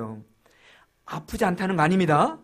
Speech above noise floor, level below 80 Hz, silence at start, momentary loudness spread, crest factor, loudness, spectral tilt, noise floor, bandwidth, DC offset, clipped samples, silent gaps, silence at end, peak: 33 dB; -50 dBFS; 0 s; 17 LU; 20 dB; -23 LUFS; -6.5 dB/octave; -57 dBFS; 14.5 kHz; under 0.1%; under 0.1%; none; 0.05 s; -6 dBFS